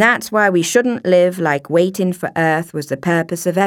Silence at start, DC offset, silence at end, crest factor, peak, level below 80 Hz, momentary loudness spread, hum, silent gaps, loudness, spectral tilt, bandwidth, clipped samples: 0 s; under 0.1%; 0 s; 16 dB; 0 dBFS; -62 dBFS; 6 LU; none; none; -16 LUFS; -5 dB/octave; 18.5 kHz; under 0.1%